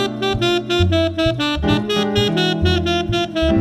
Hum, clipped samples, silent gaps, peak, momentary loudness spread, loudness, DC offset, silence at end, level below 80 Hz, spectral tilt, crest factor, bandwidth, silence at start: none; under 0.1%; none; -2 dBFS; 2 LU; -18 LUFS; under 0.1%; 0 s; -30 dBFS; -5.5 dB/octave; 16 dB; 13 kHz; 0 s